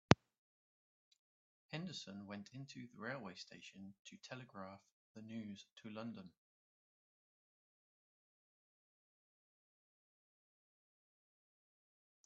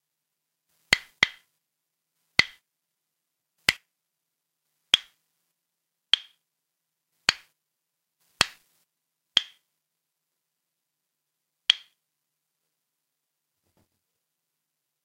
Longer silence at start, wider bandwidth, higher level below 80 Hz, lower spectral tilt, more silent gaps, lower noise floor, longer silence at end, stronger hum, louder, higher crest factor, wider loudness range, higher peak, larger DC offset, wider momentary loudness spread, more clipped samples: second, 0.1 s vs 0.9 s; second, 7.6 kHz vs 16 kHz; second, -74 dBFS vs -62 dBFS; first, -4.5 dB/octave vs 0 dB/octave; first, 0.38-1.11 s, 1.19-1.69 s, 3.99-4.05 s, 4.92-5.15 s, 5.72-5.76 s vs none; first, under -90 dBFS vs -83 dBFS; first, 5.95 s vs 3.3 s; neither; second, -46 LUFS vs -25 LUFS; first, 46 dB vs 34 dB; first, 7 LU vs 4 LU; second, -4 dBFS vs 0 dBFS; neither; first, 10 LU vs 5 LU; neither